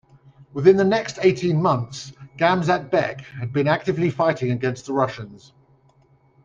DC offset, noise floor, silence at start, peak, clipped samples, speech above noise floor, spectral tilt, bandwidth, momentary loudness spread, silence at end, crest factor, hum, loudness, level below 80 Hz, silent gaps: under 0.1%; -58 dBFS; 0.4 s; -2 dBFS; under 0.1%; 37 dB; -6.5 dB/octave; 7.6 kHz; 15 LU; 1.1 s; 20 dB; none; -21 LUFS; -58 dBFS; none